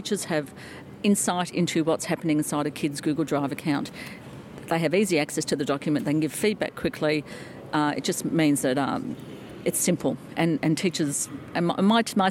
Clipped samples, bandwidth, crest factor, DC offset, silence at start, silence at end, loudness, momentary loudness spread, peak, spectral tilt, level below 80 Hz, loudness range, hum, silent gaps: under 0.1%; 17 kHz; 16 dB; under 0.1%; 0 s; 0 s; -25 LUFS; 14 LU; -10 dBFS; -4.5 dB/octave; -62 dBFS; 1 LU; none; none